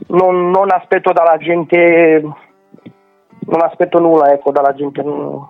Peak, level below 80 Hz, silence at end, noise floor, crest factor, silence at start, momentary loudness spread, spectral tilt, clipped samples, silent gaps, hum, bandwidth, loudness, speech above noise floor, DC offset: 0 dBFS; -64 dBFS; 0.05 s; -48 dBFS; 12 dB; 0.1 s; 10 LU; -9 dB/octave; under 0.1%; none; none; 4.4 kHz; -12 LUFS; 36 dB; under 0.1%